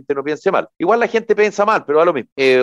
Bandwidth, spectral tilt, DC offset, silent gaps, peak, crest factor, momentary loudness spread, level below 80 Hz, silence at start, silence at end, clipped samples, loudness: 9.8 kHz; -5 dB/octave; under 0.1%; 2.32-2.36 s; -4 dBFS; 12 dB; 4 LU; -64 dBFS; 0.1 s; 0 s; under 0.1%; -16 LUFS